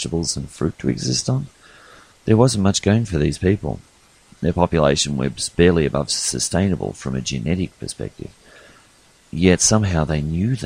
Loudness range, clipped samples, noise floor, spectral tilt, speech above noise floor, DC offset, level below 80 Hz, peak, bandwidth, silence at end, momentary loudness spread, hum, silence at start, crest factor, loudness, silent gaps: 4 LU; under 0.1%; -53 dBFS; -5 dB/octave; 34 dB; under 0.1%; -38 dBFS; 0 dBFS; 15.5 kHz; 0 s; 14 LU; none; 0 s; 20 dB; -19 LUFS; none